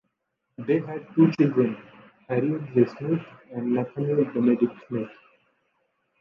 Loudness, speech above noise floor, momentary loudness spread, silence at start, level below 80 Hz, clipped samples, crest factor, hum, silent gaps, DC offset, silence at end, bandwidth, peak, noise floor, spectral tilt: -25 LUFS; 55 dB; 11 LU; 0.6 s; -70 dBFS; under 0.1%; 20 dB; none; none; under 0.1%; 1.1 s; 6.2 kHz; -6 dBFS; -79 dBFS; -10 dB/octave